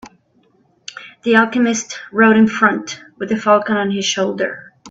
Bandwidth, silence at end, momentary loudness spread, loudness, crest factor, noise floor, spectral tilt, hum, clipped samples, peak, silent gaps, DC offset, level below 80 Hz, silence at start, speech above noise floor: 8 kHz; 0 s; 21 LU; -15 LUFS; 16 dB; -57 dBFS; -4 dB/octave; none; under 0.1%; 0 dBFS; none; under 0.1%; -62 dBFS; 0.05 s; 42 dB